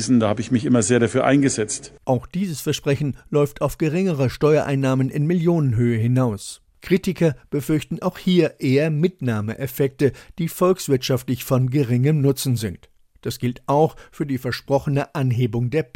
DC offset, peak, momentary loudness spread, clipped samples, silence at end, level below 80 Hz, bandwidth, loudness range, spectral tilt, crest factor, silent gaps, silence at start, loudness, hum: under 0.1%; -2 dBFS; 8 LU; under 0.1%; 0.1 s; -48 dBFS; 17 kHz; 2 LU; -6.5 dB/octave; 18 dB; none; 0 s; -21 LUFS; none